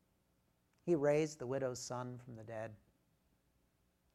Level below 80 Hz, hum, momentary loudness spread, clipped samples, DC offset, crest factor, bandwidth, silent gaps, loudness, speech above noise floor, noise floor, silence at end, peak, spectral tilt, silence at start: -76 dBFS; none; 16 LU; under 0.1%; under 0.1%; 20 dB; 13.5 kHz; none; -39 LUFS; 39 dB; -78 dBFS; 1.4 s; -22 dBFS; -6 dB/octave; 0.85 s